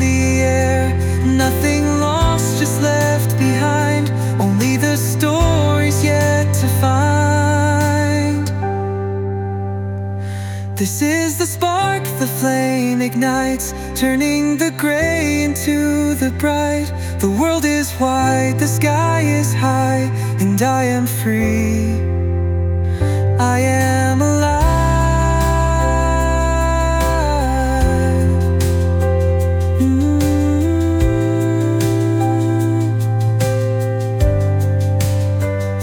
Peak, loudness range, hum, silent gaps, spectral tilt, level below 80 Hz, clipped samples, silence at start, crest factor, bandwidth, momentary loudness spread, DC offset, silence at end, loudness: -4 dBFS; 2 LU; none; none; -6 dB/octave; -26 dBFS; under 0.1%; 0 s; 12 dB; 19.5 kHz; 4 LU; under 0.1%; 0 s; -16 LUFS